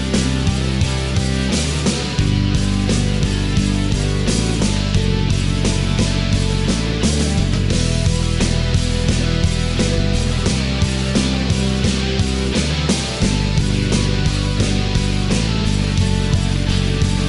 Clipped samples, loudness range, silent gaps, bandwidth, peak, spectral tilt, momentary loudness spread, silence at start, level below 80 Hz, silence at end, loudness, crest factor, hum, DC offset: under 0.1%; 0 LU; none; 11.5 kHz; -4 dBFS; -5 dB/octave; 1 LU; 0 s; -22 dBFS; 0 s; -18 LUFS; 12 dB; none; under 0.1%